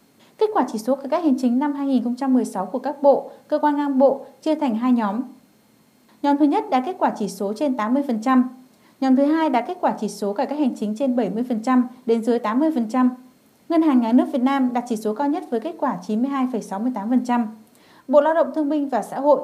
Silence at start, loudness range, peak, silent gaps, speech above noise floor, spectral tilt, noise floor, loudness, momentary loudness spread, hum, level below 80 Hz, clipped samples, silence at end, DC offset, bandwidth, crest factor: 0.4 s; 2 LU; -4 dBFS; none; 36 dB; -6.5 dB/octave; -57 dBFS; -21 LUFS; 8 LU; none; -80 dBFS; under 0.1%; 0 s; under 0.1%; 13.5 kHz; 18 dB